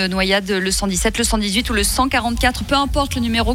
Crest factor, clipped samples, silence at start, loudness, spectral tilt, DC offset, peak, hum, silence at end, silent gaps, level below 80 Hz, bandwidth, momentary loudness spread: 14 dB; under 0.1%; 0 s; -17 LUFS; -3.5 dB/octave; under 0.1%; -4 dBFS; none; 0 s; none; -28 dBFS; 17 kHz; 2 LU